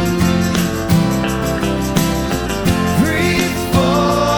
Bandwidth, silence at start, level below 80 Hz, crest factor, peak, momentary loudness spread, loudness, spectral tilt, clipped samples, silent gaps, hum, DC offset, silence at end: over 20 kHz; 0 s; -30 dBFS; 14 dB; 0 dBFS; 4 LU; -16 LUFS; -5.5 dB/octave; under 0.1%; none; none; under 0.1%; 0 s